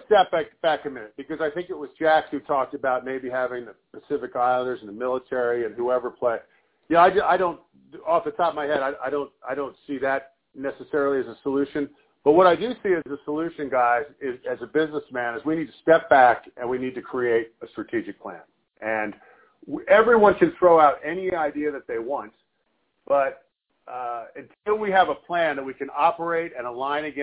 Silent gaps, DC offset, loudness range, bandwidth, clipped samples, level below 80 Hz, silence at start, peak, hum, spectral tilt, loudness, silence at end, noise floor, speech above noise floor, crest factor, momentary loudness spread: none; under 0.1%; 7 LU; 4 kHz; under 0.1%; -60 dBFS; 0.1 s; -2 dBFS; none; -9 dB/octave; -23 LUFS; 0 s; -72 dBFS; 49 dB; 22 dB; 16 LU